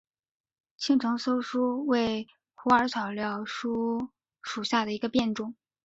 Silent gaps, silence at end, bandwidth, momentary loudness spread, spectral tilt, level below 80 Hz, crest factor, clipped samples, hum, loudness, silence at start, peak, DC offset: none; 0.3 s; 8 kHz; 12 LU; -4.5 dB/octave; -64 dBFS; 22 dB; under 0.1%; none; -28 LUFS; 0.8 s; -8 dBFS; under 0.1%